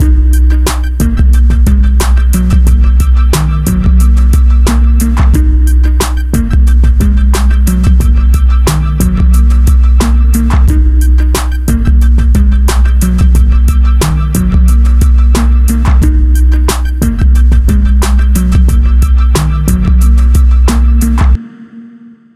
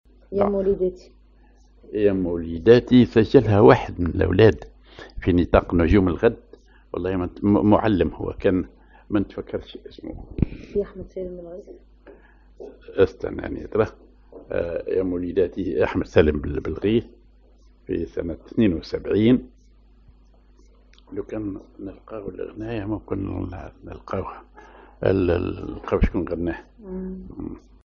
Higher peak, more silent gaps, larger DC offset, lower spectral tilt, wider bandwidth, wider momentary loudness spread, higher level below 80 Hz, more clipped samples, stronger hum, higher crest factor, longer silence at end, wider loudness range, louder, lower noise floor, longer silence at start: about the same, 0 dBFS vs 0 dBFS; neither; neither; about the same, -6.5 dB/octave vs -7 dB/octave; first, 14 kHz vs 7 kHz; second, 3 LU vs 20 LU; first, -6 dBFS vs -38 dBFS; neither; neither; second, 6 dB vs 22 dB; first, 0.5 s vs 0.3 s; second, 1 LU vs 14 LU; first, -9 LUFS vs -22 LUFS; second, -34 dBFS vs -53 dBFS; second, 0 s vs 0.3 s